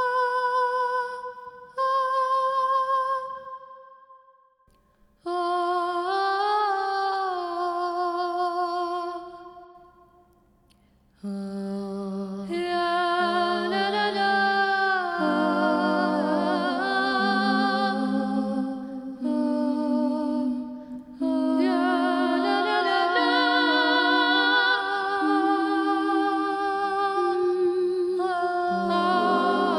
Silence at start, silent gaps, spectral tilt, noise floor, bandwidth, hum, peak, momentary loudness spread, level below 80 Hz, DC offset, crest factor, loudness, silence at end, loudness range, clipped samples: 0 s; none; -5.5 dB/octave; -62 dBFS; 11.5 kHz; none; -8 dBFS; 11 LU; -66 dBFS; under 0.1%; 16 dB; -24 LUFS; 0 s; 9 LU; under 0.1%